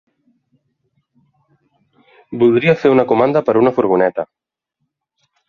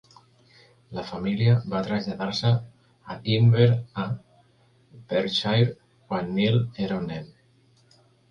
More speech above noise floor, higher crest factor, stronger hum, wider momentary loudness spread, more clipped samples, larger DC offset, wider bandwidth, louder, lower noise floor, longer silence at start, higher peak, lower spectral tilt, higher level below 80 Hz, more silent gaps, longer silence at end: first, 61 dB vs 37 dB; about the same, 16 dB vs 18 dB; neither; about the same, 12 LU vs 14 LU; neither; neither; about the same, 6.6 kHz vs 7 kHz; first, -14 LUFS vs -25 LUFS; first, -74 dBFS vs -61 dBFS; first, 2.3 s vs 0.9 s; first, 0 dBFS vs -6 dBFS; about the same, -8.5 dB/octave vs -7.5 dB/octave; about the same, -56 dBFS vs -56 dBFS; neither; first, 1.25 s vs 1.05 s